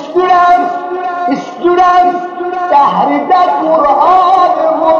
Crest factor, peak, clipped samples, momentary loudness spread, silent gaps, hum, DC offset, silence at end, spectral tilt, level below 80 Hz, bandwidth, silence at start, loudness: 8 dB; 0 dBFS; under 0.1%; 9 LU; none; none; under 0.1%; 0 s; -5.5 dB/octave; -48 dBFS; 7 kHz; 0 s; -10 LUFS